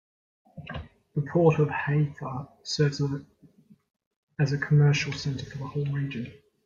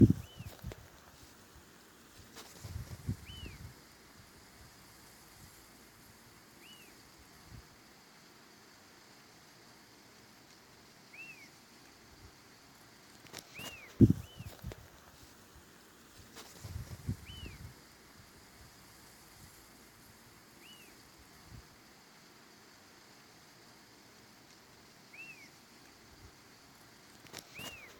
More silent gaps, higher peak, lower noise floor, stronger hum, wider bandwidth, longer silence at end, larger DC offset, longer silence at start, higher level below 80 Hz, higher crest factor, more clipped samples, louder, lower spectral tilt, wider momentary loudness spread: first, 4.06-4.28 s vs none; about the same, -8 dBFS vs -10 dBFS; about the same, -57 dBFS vs -59 dBFS; neither; second, 7.6 kHz vs 18 kHz; first, 0.3 s vs 0.05 s; neither; first, 0.55 s vs 0 s; about the same, -58 dBFS vs -56 dBFS; second, 20 dB vs 32 dB; neither; first, -27 LUFS vs -39 LUFS; about the same, -6.5 dB/octave vs -6.5 dB/octave; first, 18 LU vs 13 LU